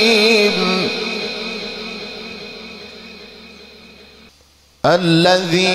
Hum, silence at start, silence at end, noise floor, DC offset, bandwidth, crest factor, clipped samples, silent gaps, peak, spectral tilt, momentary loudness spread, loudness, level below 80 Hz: none; 0 s; 0 s; -51 dBFS; under 0.1%; 15 kHz; 16 dB; under 0.1%; none; -2 dBFS; -4.5 dB/octave; 23 LU; -16 LUFS; -54 dBFS